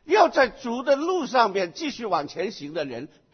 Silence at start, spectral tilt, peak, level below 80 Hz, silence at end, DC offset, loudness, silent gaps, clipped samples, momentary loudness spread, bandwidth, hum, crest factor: 0.05 s; -4 dB/octave; -4 dBFS; -62 dBFS; 0.25 s; under 0.1%; -24 LUFS; none; under 0.1%; 12 LU; 6.6 kHz; none; 20 dB